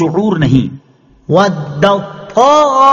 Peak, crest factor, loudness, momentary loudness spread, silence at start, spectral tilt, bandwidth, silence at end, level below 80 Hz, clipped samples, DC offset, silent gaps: 0 dBFS; 10 dB; -11 LUFS; 9 LU; 0 s; -6.5 dB/octave; 7.4 kHz; 0 s; -42 dBFS; 0.2%; under 0.1%; none